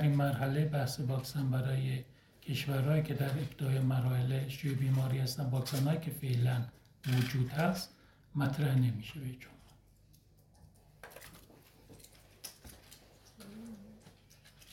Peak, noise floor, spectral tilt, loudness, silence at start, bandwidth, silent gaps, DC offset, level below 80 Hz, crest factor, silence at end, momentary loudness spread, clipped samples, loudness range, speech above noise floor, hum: -18 dBFS; -63 dBFS; -6.5 dB/octave; -34 LUFS; 0 s; 16.5 kHz; none; under 0.1%; -62 dBFS; 16 dB; 0.65 s; 21 LU; under 0.1%; 20 LU; 31 dB; none